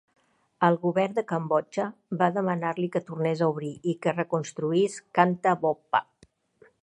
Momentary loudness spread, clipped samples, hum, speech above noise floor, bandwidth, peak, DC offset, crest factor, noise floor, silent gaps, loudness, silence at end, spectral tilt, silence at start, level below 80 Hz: 6 LU; under 0.1%; none; 36 dB; 11 kHz; -4 dBFS; under 0.1%; 22 dB; -61 dBFS; none; -27 LUFS; 0.8 s; -6.5 dB/octave; 0.6 s; -74 dBFS